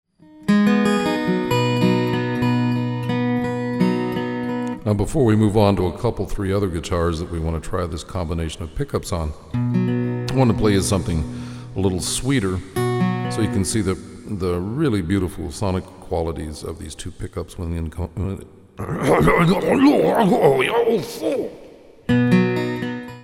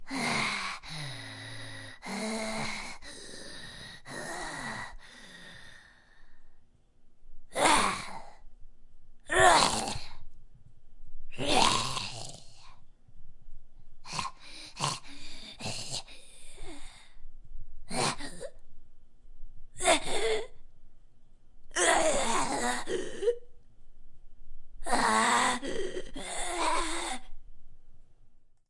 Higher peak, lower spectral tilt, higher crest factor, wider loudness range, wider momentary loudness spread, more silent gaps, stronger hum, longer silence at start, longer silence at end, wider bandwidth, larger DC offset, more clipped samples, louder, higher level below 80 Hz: first, -2 dBFS vs -6 dBFS; first, -6 dB/octave vs -2 dB/octave; second, 18 dB vs 28 dB; second, 7 LU vs 12 LU; second, 13 LU vs 24 LU; neither; neither; first, 0.35 s vs 0 s; second, 0 s vs 0.15 s; first, 16 kHz vs 11.5 kHz; neither; neither; first, -21 LUFS vs -30 LUFS; first, -38 dBFS vs -46 dBFS